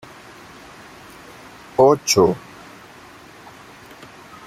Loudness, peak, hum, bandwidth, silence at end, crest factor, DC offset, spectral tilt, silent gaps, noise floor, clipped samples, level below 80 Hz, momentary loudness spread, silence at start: -17 LUFS; -2 dBFS; none; 15.5 kHz; 2.1 s; 22 dB; under 0.1%; -4 dB/octave; none; -43 dBFS; under 0.1%; -56 dBFS; 27 LU; 1.8 s